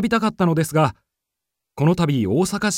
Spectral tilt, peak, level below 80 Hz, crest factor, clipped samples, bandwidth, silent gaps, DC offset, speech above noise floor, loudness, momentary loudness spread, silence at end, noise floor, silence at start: -6 dB/octave; -4 dBFS; -50 dBFS; 16 dB; under 0.1%; 16 kHz; none; under 0.1%; 64 dB; -20 LUFS; 2 LU; 0 s; -83 dBFS; 0 s